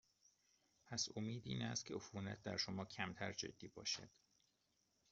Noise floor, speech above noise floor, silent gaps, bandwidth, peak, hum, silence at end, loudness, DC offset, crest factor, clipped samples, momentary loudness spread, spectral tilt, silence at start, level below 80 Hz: -83 dBFS; 36 dB; none; 7.6 kHz; -26 dBFS; none; 1.05 s; -47 LUFS; under 0.1%; 22 dB; under 0.1%; 6 LU; -3.5 dB/octave; 0.85 s; -78 dBFS